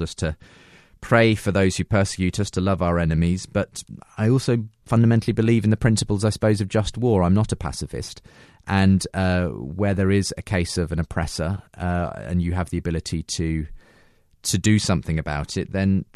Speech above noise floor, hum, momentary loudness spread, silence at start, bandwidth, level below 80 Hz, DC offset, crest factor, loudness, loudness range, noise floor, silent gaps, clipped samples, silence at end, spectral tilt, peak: 35 dB; none; 10 LU; 0 s; 13 kHz; -38 dBFS; under 0.1%; 18 dB; -22 LUFS; 5 LU; -56 dBFS; none; under 0.1%; 0.1 s; -6 dB/octave; -4 dBFS